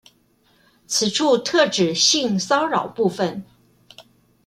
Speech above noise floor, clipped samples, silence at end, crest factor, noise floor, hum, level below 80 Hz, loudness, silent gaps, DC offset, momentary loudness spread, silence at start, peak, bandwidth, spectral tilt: 41 dB; under 0.1%; 0.45 s; 18 dB; -60 dBFS; none; -66 dBFS; -19 LUFS; none; under 0.1%; 8 LU; 0.9 s; -4 dBFS; 15.5 kHz; -3 dB/octave